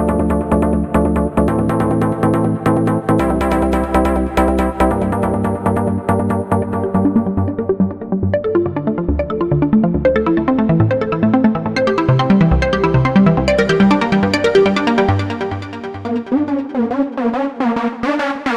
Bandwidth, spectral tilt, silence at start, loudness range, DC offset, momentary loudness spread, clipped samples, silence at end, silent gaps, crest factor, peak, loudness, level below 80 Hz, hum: 12.5 kHz; -7.5 dB/octave; 0 s; 4 LU; under 0.1%; 6 LU; under 0.1%; 0 s; none; 14 dB; 0 dBFS; -16 LUFS; -28 dBFS; none